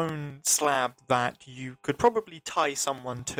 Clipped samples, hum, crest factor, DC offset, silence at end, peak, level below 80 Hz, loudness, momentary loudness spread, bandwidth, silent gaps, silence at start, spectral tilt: under 0.1%; none; 20 dB; under 0.1%; 0 s; -10 dBFS; -62 dBFS; -27 LUFS; 11 LU; over 20 kHz; none; 0 s; -3 dB/octave